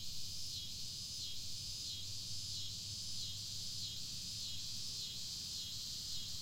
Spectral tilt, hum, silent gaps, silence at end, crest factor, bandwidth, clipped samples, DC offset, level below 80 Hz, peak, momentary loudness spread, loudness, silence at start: -1 dB/octave; none; none; 0 s; 14 dB; 16 kHz; under 0.1%; under 0.1%; -62 dBFS; -28 dBFS; 1 LU; -42 LUFS; 0 s